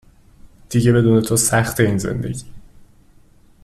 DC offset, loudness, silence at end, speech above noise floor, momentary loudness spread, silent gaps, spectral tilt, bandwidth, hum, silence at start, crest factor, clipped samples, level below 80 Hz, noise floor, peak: under 0.1%; -17 LUFS; 0.8 s; 33 dB; 11 LU; none; -5.5 dB/octave; 15 kHz; none; 0.45 s; 16 dB; under 0.1%; -44 dBFS; -49 dBFS; -2 dBFS